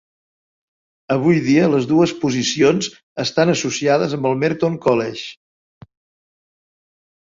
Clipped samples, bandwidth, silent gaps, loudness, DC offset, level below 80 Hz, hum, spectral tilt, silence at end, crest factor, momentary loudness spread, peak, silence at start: under 0.1%; 7.8 kHz; 3.03-3.16 s; -17 LUFS; under 0.1%; -58 dBFS; none; -5 dB/octave; 1.95 s; 16 dB; 9 LU; -2 dBFS; 1.1 s